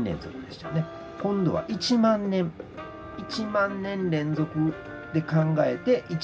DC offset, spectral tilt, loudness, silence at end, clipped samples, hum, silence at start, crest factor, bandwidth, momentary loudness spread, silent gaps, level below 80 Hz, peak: under 0.1%; -7 dB/octave; -27 LUFS; 0 s; under 0.1%; none; 0 s; 16 dB; 8 kHz; 16 LU; none; -54 dBFS; -12 dBFS